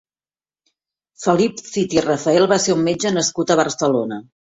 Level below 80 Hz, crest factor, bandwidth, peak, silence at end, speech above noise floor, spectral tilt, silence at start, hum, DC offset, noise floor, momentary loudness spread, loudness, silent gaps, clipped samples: -56 dBFS; 18 dB; 8.4 kHz; -2 dBFS; 0.35 s; over 72 dB; -4 dB/octave; 1.2 s; none; under 0.1%; under -90 dBFS; 8 LU; -18 LUFS; none; under 0.1%